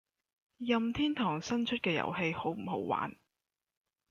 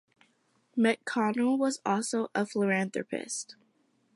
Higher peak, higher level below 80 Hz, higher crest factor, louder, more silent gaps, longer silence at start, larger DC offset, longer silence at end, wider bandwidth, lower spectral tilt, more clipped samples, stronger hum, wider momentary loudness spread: second, -18 dBFS vs -12 dBFS; first, -66 dBFS vs -82 dBFS; about the same, 18 dB vs 18 dB; second, -34 LUFS vs -30 LUFS; neither; second, 0.6 s vs 0.75 s; neither; first, 1 s vs 0.65 s; second, 7.4 kHz vs 11.5 kHz; about the same, -5.5 dB/octave vs -4.5 dB/octave; neither; neither; second, 5 LU vs 9 LU